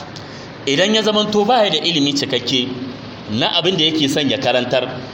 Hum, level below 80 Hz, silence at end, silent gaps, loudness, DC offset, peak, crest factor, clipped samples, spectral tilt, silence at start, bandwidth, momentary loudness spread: none; -54 dBFS; 0 s; none; -16 LUFS; under 0.1%; -2 dBFS; 16 dB; under 0.1%; -4 dB/octave; 0 s; 16.5 kHz; 15 LU